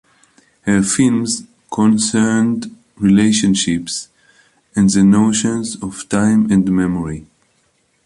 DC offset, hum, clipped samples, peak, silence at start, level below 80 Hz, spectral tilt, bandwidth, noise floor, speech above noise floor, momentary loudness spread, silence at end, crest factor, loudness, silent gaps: under 0.1%; none; under 0.1%; -2 dBFS; 0.65 s; -46 dBFS; -5 dB/octave; 11.5 kHz; -61 dBFS; 46 dB; 13 LU; 0.85 s; 14 dB; -15 LUFS; none